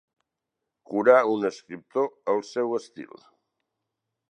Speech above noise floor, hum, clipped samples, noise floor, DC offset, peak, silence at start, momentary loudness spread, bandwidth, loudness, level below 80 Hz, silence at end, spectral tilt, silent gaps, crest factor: 60 dB; none; under 0.1%; -84 dBFS; under 0.1%; -4 dBFS; 0.9 s; 23 LU; 9.6 kHz; -25 LUFS; -80 dBFS; 1.25 s; -5.5 dB/octave; none; 24 dB